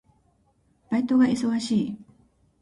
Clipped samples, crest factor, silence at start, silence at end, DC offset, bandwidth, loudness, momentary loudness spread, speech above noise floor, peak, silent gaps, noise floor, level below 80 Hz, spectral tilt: under 0.1%; 16 dB; 0.9 s; 0.6 s; under 0.1%; 11.5 kHz; -24 LUFS; 11 LU; 43 dB; -10 dBFS; none; -65 dBFS; -62 dBFS; -5.5 dB/octave